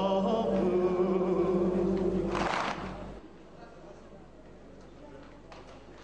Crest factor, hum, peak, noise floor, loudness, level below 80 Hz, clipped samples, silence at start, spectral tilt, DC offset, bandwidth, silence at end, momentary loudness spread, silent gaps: 16 dB; none; -16 dBFS; -51 dBFS; -29 LUFS; -50 dBFS; under 0.1%; 0 s; -7 dB/octave; 0.1%; 9 kHz; 0 s; 23 LU; none